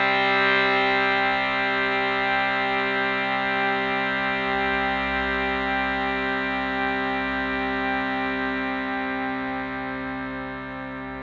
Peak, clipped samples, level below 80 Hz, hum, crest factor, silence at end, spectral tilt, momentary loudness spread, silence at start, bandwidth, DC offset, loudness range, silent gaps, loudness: -8 dBFS; under 0.1%; -48 dBFS; none; 16 dB; 0 s; -5.5 dB/octave; 10 LU; 0 s; 7.4 kHz; under 0.1%; 5 LU; none; -23 LUFS